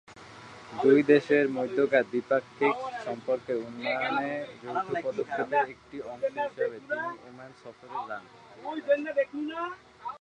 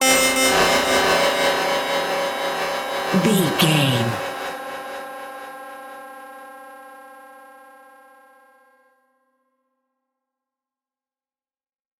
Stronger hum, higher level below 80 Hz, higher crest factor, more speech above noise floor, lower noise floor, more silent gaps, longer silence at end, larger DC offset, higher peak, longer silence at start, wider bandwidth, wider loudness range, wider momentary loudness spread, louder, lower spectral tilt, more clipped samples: neither; second, -72 dBFS vs -54 dBFS; about the same, 22 dB vs 20 dB; second, 19 dB vs over 72 dB; second, -48 dBFS vs under -90 dBFS; neither; second, 0.05 s vs 4.5 s; neither; second, -8 dBFS vs -4 dBFS; about the same, 0.1 s vs 0 s; second, 9.2 kHz vs 17 kHz; second, 8 LU vs 22 LU; second, 19 LU vs 23 LU; second, -29 LUFS vs -19 LUFS; first, -6 dB/octave vs -3 dB/octave; neither